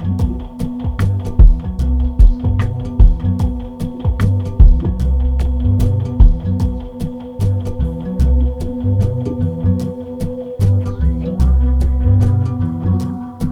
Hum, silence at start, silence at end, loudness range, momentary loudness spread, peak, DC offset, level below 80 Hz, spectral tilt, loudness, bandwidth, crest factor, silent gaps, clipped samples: none; 0 s; 0 s; 3 LU; 11 LU; 0 dBFS; under 0.1%; -16 dBFS; -9 dB/octave; -17 LUFS; 10 kHz; 14 dB; none; 0.6%